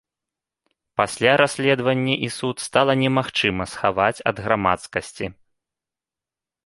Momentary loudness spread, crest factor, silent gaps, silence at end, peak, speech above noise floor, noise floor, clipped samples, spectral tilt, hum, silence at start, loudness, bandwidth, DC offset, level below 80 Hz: 11 LU; 22 dB; none; 1.35 s; -2 dBFS; 68 dB; -89 dBFS; under 0.1%; -4.5 dB/octave; none; 1 s; -21 LUFS; 11.5 kHz; under 0.1%; -52 dBFS